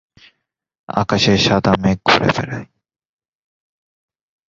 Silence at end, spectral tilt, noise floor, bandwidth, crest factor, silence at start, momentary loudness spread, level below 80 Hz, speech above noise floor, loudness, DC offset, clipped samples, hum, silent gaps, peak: 1.85 s; -5 dB/octave; -68 dBFS; 7.6 kHz; 20 dB; 0.9 s; 11 LU; -44 dBFS; 53 dB; -15 LUFS; under 0.1%; under 0.1%; none; none; 0 dBFS